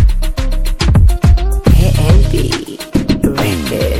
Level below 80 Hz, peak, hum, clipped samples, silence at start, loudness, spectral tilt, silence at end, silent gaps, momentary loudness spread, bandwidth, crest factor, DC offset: -12 dBFS; 0 dBFS; none; under 0.1%; 0 s; -13 LUFS; -6.5 dB/octave; 0 s; none; 8 LU; 16 kHz; 10 dB; under 0.1%